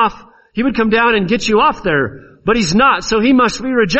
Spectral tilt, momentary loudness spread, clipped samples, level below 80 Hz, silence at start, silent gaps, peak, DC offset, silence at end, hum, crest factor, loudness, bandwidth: -4.5 dB/octave; 7 LU; under 0.1%; -38 dBFS; 0 s; none; 0 dBFS; under 0.1%; 0 s; none; 12 dB; -14 LUFS; 8.4 kHz